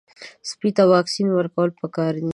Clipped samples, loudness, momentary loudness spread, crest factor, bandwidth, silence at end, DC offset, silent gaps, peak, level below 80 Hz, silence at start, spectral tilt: under 0.1%; -20 LUFS; 11 LU; 18 dB; 11.5 kHz; 0 s; under 0.1%; none; -2 dBFS; -68 dBFS; 0.2 s; -6 dB/octave